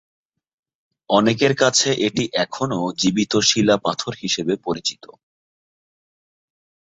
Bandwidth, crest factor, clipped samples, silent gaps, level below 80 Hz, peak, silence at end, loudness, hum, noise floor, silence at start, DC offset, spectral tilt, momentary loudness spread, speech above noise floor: 8.4 kHz; 20 dB; under 0.1%; none; -58 dBFS; -2 dBFS; 1.9 s; -19 LUFS; none; under -90 dBFS; 1.1 s; under 0.1%; -3.5 dB/octave; 8 LU; over 71 dB